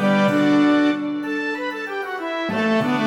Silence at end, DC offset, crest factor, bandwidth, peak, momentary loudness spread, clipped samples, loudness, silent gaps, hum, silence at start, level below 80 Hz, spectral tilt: 0 s; under 0.1%; 12 dB; 11 kHz; -8 dBFS; 10 LU; under 0.1%; -20 LUFS; none; none; 0 s; -66 dBFS; -6.5 dB/octave